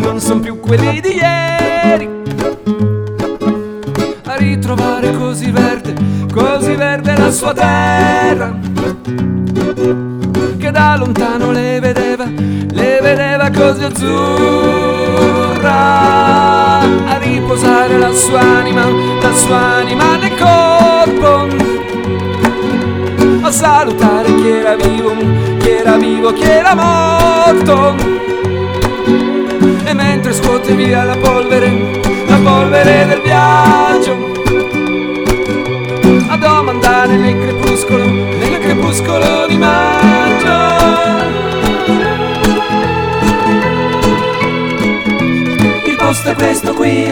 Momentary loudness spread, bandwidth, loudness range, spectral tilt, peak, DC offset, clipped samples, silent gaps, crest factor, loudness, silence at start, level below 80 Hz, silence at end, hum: 7 LU; over 20 kHz; 4 LU; -5 dB/octave; 0 dBFS; under 0.1%; 0.3%; none; 10 dB; -11 LUFS; 0 s; -32 dBFS; 0 s; none